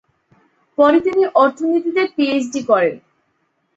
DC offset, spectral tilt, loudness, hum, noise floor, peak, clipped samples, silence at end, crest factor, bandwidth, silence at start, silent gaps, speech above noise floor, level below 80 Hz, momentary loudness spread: under 0.1%; -4.5 dB/octave; -16 LUFS; none; -66 dBFS; -2 dBFS; under 0.1%; 0.8 s; 16 dB; 8 kHz; 0.8 s; none; 51 dB; -62 dBFS; 7 LU